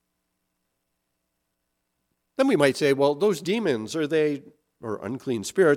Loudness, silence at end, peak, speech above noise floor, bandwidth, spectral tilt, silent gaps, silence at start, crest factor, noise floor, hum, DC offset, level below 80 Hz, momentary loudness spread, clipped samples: -24 LUFS; 0 s; -4 dBFS; 55 dB; 16 kHz; -5 dB/octave; none; 2.4 s; 22 dB; -78 dBFS; none; under 0.1%; -70 dBFS; 14 LU; under 0.1%